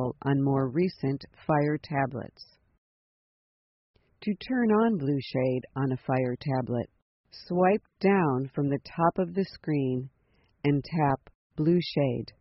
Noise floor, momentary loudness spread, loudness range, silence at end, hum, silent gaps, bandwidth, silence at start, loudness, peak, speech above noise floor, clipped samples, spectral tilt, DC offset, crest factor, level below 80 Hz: -47 dBFS; 9 LU; 4 LU; 0.1 s; none; 2.78-3.94 s, 7.02-7.24 s, 11.35-11.50 s; 5.8 kHz; 0 s; -28 LUFS; -10 dBFS; 19 dB; under 0.1%; -7 dB/octave; under 0.1%; 18 dB; -60 dBFS